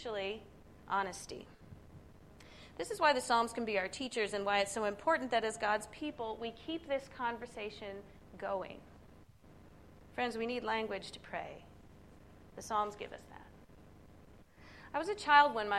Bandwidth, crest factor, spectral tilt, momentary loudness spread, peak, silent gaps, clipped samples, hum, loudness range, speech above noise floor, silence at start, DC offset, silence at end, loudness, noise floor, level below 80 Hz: 14 kHz; 26 dB; -3 dB/octave; 24 LU; -12 dBFS; none; under 0.1%; none; 10 LU; 24 dB; 0 s; under 0.1%; 0 s; -35 LUFS; -59 dBFS; -64 dBFS